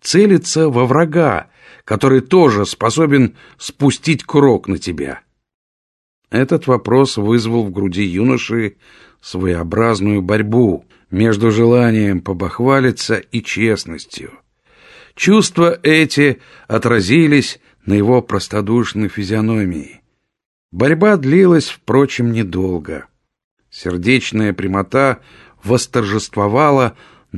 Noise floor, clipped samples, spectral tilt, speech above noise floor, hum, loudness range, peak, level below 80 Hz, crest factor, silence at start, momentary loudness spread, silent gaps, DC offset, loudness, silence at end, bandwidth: -48 dBFS; under 0.1%; -6 dB/octave; 34 dB; none; 4 LU; 0 dBFS; -40 dBFS; 14 dB; 0.05 s; 13 LU; 5.54-6.22 s, 20.46-20.69 s, 23.44-23.57 s; under 0.1%; -14 LUFS; 0 s; 12.5 kHz